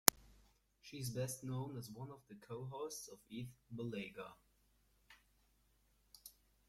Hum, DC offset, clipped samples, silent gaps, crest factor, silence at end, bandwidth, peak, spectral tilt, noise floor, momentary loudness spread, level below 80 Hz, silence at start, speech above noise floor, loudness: 50 Hz at -80 dBFS; under 0.1%; under 0.1%; none; 44 dB; 0.35 s; 16.5 kHz; -2 dBFS; -3 dB/octave; -76 dBFS; 20 LU; -72 dBFS; 0.05 s; 29 dB; -46 LUFS